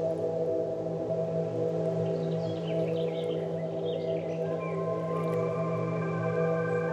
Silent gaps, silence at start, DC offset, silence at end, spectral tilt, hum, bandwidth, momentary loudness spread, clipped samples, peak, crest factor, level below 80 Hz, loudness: none; 0 s; under 0.1%; 0 s; -8.5 dB/octave; none; 8.2 kHz; 3 LU; under 0.1%; -18 dBFS; 12 dB; -70 dBFS; -31 LUFS